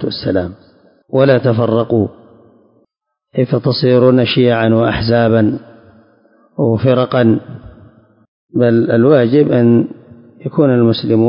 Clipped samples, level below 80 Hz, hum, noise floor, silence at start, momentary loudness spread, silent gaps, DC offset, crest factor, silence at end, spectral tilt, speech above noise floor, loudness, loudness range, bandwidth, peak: under 0.1%; -44 dBFS; none; -64 dBFS; 0 s; 12 LU; 8.28-8.49 s; under 0.1%; 14 dB; 0 s; -12.5 dB/octave; 52 dB; -13 LUFS; 4 LU; 5.4 kHz; 0 dBFS